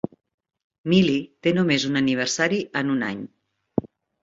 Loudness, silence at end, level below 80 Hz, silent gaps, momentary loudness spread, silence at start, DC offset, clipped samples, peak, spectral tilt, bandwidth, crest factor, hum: -22 LUFS; 0.35 s; -60 dBFS; none; 14 LU; 0.85 s; under 0.1%; under 0.1%; -6 dBFS; -5 dB/octave; 7.8 kHz; 18 dB; none